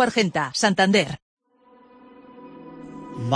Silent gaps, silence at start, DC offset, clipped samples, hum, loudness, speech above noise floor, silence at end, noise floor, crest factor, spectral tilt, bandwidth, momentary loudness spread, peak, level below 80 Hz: 1.22-1.37 s; 0 s; under 0.1%; under 0.1%; none; -21 LUFS; 35 dB; 0 s; -55 dBFS; 20 dB; -4.5 dB/octave; 10.5 kHz; 24 LU; -4 dBFS; -60 dBFS